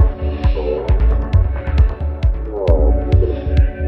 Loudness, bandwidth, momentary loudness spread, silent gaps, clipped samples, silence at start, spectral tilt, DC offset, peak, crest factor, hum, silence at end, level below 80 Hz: -17 LUFS; 4.7 kHz; 5 LU; none; under 0.1%; 0 s; -9.5 dB/octave; under 0.1%; 0 dBFS; 14 dB; none; 0 s; -16 dBFS